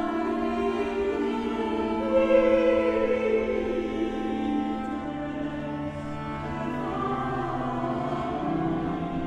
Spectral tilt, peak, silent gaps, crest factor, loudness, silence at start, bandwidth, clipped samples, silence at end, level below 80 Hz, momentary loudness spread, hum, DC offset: -7.5 dB/octave; -8 dBFS; none; 18 dB; -27 LUFS; 0 s; 10 kHz; under 0.1%; 0 s; -46 dBFS; 11 LU; none; under 0.1%